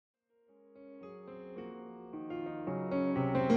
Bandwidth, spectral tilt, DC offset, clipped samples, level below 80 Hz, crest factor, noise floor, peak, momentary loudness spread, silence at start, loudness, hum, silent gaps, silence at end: 6 kHz; -8.5 dB/octave; under 0.1%; under 0.1%; -68 dBFS; 20 dB; -67 dBFS; -16 dBFS; 19 LU; 0.75 s; -38 LUFS; none; none; 0 s